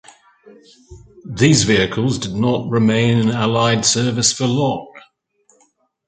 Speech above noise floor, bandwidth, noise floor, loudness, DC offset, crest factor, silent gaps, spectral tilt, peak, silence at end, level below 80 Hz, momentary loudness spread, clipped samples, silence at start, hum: 43 dB; 9.6 kHz; -60 dBFS; -16 LUFS; under 0.1%; 18 dB; none; -4.5 dB/octave; 0 dBFS; 1.1 s; -46 dBFS; 7 LU; under 0.1%; 0.45 s; none